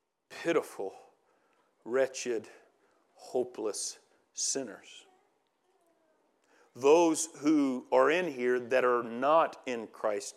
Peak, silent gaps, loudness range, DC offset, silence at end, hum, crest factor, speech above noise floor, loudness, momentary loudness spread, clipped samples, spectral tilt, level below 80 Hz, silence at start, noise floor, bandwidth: -12 dBFS; none; 10 LU; under 0.1%; 0.05 s; none; 20 dB; 44 dB; -30 LUFS; 14 LU; under 0.1%; -3 dB/octave; under -90 dBFS; 0.3 s; -74 dBFS; 14.5 kHz